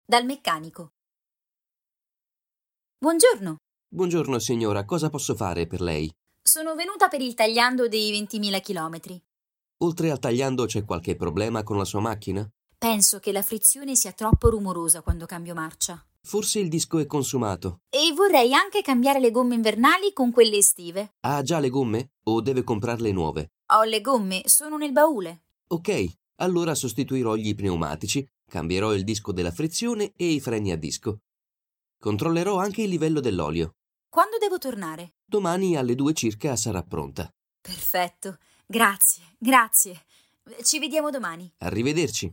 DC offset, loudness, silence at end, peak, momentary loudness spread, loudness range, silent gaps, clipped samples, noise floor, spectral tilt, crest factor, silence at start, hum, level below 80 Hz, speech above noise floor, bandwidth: under 0.1%; -23 LUFS; 0 s; -4 dBFS; 13 LU; 6 LU; none; under 0.1%; under -90 dBFS; -3.5 dB/octave; 22 dB; 0.1 s; none; -44 dBFS; over 66 dB; 17 kHz